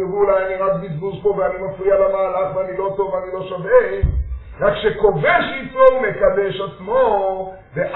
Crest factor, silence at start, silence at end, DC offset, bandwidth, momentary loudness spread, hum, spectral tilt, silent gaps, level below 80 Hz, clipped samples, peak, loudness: 18 dB; 0 s; 0 s; under 0.1%; 4.2 kHz; 11 LU; none; -4.5 dB/octave; none; -32 dBFS; under 0.1%; 0 dBFS; -18 LUFS